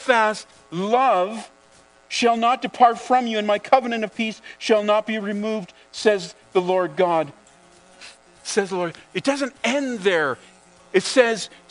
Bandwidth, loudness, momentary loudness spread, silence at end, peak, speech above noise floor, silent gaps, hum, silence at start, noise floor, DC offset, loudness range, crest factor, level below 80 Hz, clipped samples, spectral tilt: 10.5 kHz; -21 LUFS; 10 LU; 0.25 s; 0 dBFS; 32 dB; none; none; 0 s; -53 dBFS; under 0.1%; 4 LU; 22 dB; -70 dBFS; under 0.1%; -4 dB/octave